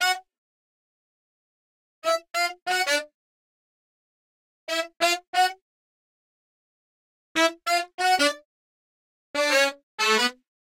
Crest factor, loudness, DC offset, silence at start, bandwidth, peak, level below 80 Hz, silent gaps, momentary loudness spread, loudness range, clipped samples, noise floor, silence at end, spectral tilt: 20 dB; -24 LUFS; under 0.1%; 0 s; 16 kHz; -8 dBFS; -78 dBFS; 0.38-2.02 s, 2.62-2.66 s, 3.14-4.67 s, 5.27-5.33 s, 5.62-7.35 s, 7.94-7.98 s, 8.45-9.34 s, 9.83-9.98 s; 9 LU; 5 LU; under 0.1%; under -90 dBFS; 0.35 s; 0 dB/octave